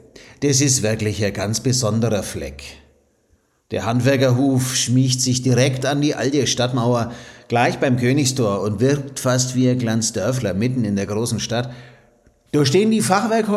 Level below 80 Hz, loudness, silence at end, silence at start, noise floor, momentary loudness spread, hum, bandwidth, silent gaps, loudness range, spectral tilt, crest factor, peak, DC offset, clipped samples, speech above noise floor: -50 dBFS; -19 LUFS; 0 s; 0.15 s; -61 dBFS; 8 LU; none; 15 kHz; none; 4 LU; -4.5 dB/octave; 16 dB; -2 dBFS; under 0.1%; under 0.1%; 43 dB